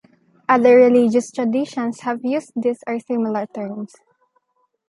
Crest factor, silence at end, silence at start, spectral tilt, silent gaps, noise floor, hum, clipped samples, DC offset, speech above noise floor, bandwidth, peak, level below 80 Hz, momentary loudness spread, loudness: 16 dB; 1.05 s; 0.5 s; -6 dB/octave; none; -67 dBFS; none; under 0.1%; under 0.1%; 49 dB; 11 kHz; -2 dBFS; -72 dBFS; 17 LU; -18 LUFS